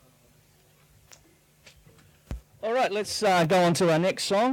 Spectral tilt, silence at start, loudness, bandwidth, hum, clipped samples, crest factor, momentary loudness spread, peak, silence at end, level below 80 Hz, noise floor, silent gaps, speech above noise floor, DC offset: -4.5 dB/octave; 2.3 s; -24 LUFS; 18 kHz; none; under 0.1%; 12 dB; 21 LU; -14 dBFS; 0 s; -52 dBFS; -60 dBFS; none; 37 dB; under 0.1%